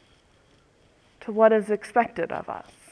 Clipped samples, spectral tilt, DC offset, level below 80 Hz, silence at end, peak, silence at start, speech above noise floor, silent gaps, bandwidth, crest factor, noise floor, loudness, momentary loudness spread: under 0.1%; -6 dB/octave; under 0.1%; -66 dBFS; 0.3 s; -6 dBFS; 1.25 s; 36 dB; none; 11 kHz; 22 dB; -60 dBFS; -24 LUFS; 18 LU